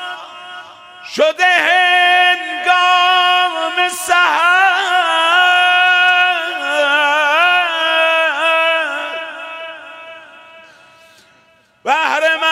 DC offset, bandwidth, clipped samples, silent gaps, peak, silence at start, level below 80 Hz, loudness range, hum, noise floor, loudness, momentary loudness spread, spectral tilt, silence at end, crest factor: under 0.1%; 16 kHz; under 0.1%; none; 0 dBFS; 0 s; -70 dBFS; 9 LU; none; -52 dBFS; -12 LUFS; 17 LU; 0.5 dB/octave; 0 s; 14 dB